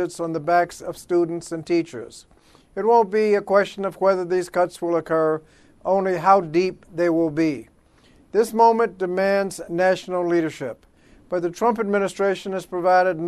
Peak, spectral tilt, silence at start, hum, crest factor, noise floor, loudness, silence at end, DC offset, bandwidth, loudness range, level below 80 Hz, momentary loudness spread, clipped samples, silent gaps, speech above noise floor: -2 dBFS; -6 dB/octave; 0 s; none; 18 dB; -54 dBFS; -21 LUFS; 0 s; under 0.1%; 13.5 kHz; 2 LU; -60 dBFS; 11 LU; under 0.1%; none; 34 dB